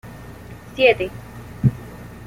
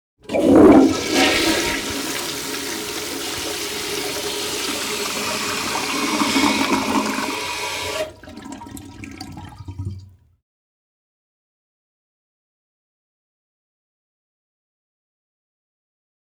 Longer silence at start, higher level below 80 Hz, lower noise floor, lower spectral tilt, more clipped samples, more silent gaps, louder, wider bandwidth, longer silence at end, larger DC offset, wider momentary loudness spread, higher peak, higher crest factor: second, 0.05 s vs 0.3 s; about the same, -44 dBFS vs -48 dBFS; about the same, -38 dBFS vs -40 dBFS; first, -7 dB/octave vs -3 dB/octave; neither; neither; about the same, -19 LUFS vs -19 LUFS; second, 16 kHz vs over 20 kHz; second, 0 s vs 6.25 s; neither; about the same, 22 LU vs 20 LU; about the same, -2 dBFS vs -4 dBFS; about the same, 20 dB vs 18 dB